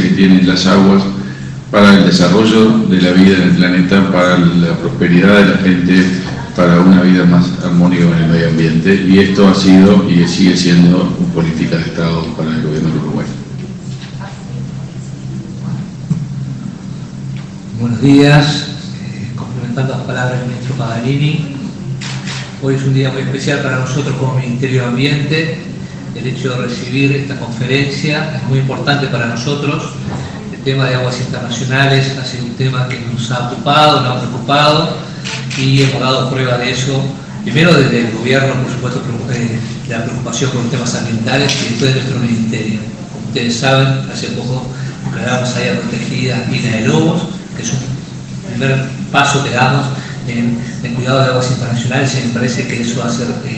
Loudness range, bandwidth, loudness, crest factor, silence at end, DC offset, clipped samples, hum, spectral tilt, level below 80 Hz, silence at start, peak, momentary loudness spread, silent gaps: 8 LU; 9 kHz; -12 LUFS; 12 dB; 0 s; under 0.1%; 0.3%; none; -6 dB/octave; -40 dBFS; 0 s; 0 dBFS; 15 LU; none